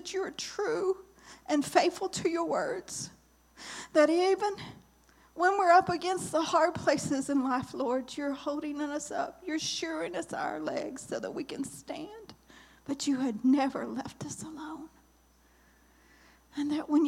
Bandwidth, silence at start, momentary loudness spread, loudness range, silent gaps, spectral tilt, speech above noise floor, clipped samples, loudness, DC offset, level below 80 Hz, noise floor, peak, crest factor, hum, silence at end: 15.5 kHz; 0 s; 16 LU; 8 LU; none; -4 dB/octave; 33 dB; under 0.1%; -31 LUFS; under 0.1%; -66 dBFS; -64 dBFS; -8 dBFS; 22 dB; none; 0 s